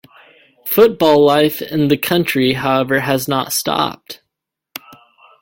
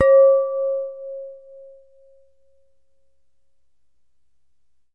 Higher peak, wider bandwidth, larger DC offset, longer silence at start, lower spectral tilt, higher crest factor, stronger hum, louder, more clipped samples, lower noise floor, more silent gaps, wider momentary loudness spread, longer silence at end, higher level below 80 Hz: first, 0 dBFS vs -4 dBFS; first, 17 kHz vs 2.9 kHz; second, under 0.1% vs 0.2%; first, 0.65 s vs 0 s; about the same, -4.5 dB/octave vs -5.5 dB/octave; about the same, 16 dB vs 18 dB; neither; first, -15 LUFS vs -18 LUFS; neither; about the same, -79 dBFS vs -76 dBFS; neither; about the same, 22 LU vs 22 LU; second, 1.25 s vs 3.6 s; first, -54 dBFS vs -64 dBFS